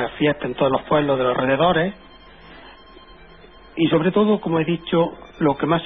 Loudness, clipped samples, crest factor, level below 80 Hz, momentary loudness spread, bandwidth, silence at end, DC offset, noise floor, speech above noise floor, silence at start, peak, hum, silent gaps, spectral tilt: -20 LUFS; under 0.1%; 14 dB; -48 dBFS; 5 LU; 4.5 kHz; 0 s; 0.2%; -45 dBFS; 26 dB; 0 s; -6 dBFS; none; none; -10 dB/octave